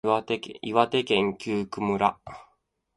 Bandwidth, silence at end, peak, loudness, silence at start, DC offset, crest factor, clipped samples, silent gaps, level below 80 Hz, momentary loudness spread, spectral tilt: 11.5 kHz; 0.55 s; -4 dBFS; -26 LUFS; 0.05 s; under 0.1%; 24 dB; under 0.1%; none; -60 dBFS; 8 LU; -5.5 dB/octave